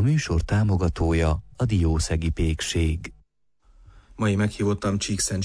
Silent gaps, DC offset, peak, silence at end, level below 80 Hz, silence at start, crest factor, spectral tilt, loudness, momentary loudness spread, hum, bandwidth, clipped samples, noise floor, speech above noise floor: none; under 0.1%; -12 dBFS; 0 s; -32 dBFS; 0 s; 12 dB; -5.5 dB/octave; -24 LUFS; 4 LU; none; 11 kHz; under 0.1%; -62 dBFS; 39 dB